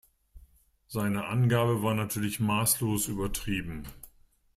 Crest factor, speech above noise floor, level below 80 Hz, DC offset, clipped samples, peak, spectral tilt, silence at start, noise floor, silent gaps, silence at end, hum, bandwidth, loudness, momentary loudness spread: 18 dB; 32 dB; -48 dBFS; under 0.1%; under 0.1%; -12 dBFS; -5 dB/octave; 0.35 s; -61 dBFS; none; 0.45 s; none; 16 kHz; -29 LUFS; 12 LU